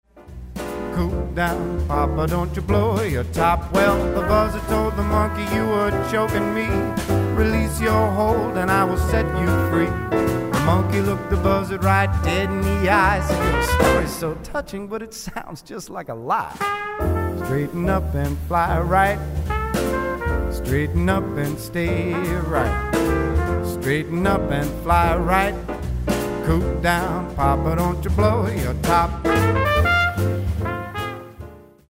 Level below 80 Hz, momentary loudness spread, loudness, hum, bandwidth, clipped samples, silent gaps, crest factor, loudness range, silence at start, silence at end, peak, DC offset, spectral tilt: -30 dBFS; 9 LU; -21 LUFS; none; 16 kHz; under 0.1%; none; 18 dB; 4 LU; 0.15 s; 0.3 s; -4 dBFS; under 0.1%; -6.5 dB/octave